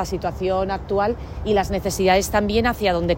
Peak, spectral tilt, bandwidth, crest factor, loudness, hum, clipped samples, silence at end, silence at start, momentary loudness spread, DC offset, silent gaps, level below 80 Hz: -4 dBFS; -5 dB/octave; 16.5 kHz; 16 dB; -21 LUFS; none; under 0.1%; 0 s; 0 s; 6 LU; under 0.1%; none; -34 dBFS